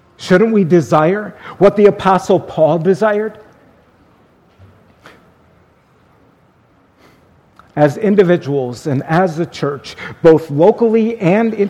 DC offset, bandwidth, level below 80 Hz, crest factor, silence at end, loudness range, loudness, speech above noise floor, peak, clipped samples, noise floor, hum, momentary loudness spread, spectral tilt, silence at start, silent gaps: under 0.1%; 12.5 kHz; -50 dBFS; 14 dB; 0 s; 9 LU; -13 LUFS; 39 dB; 0 dBFS; 0.1%; -52 dBFS; none; 10 LU; -7.5 dB/octave; 0.2 s; none